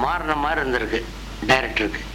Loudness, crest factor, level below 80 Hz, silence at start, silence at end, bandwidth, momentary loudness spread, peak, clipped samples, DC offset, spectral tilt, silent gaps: -22 LUFS; 18 dB; -36 dBFS; 0 s; 0 s; 19 kHz; 9 LU; -6 dBFS; under 0.1%; under 0.1%; -4.5 dB/octave; none